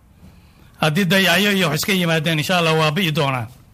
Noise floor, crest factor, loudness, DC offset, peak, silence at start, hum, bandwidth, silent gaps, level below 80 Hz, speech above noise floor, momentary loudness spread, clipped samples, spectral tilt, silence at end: -47 dBFS; 16 dB; -17 LUFS; under 0.1%; -2 dBFS; 0.25 s; none; 16 kHz; none; -52 dBFS; 30 dB; 6 LU; under 0.1%; -4.5 dB/octave; 0.2 s